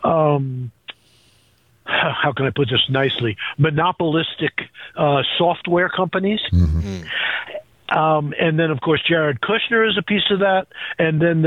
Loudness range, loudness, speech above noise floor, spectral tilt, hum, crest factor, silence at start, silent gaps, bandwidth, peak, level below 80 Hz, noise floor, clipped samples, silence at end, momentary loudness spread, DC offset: 2 LU; -19 LUFS; 39 dB; -7.5 dB/octave; none; 14 dB; 0 s; none; 7 kHz; -6 dBFS; -40 dBFS; -57 dBFS; under 0.1%; 0 s; 10 LU; under 0.1%